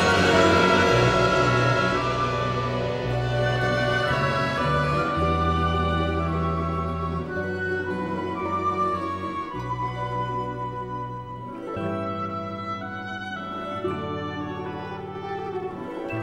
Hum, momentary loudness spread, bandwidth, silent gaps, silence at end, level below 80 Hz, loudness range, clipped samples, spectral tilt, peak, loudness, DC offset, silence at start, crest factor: none; 13 LU; 12.5 kHz; none; 0 s; -40 dBFS; 9 LU; under 0.1%; -6 dB/octave; -6 dBFS; -25 LUFS; under 0.1%; 0 s; 18 dB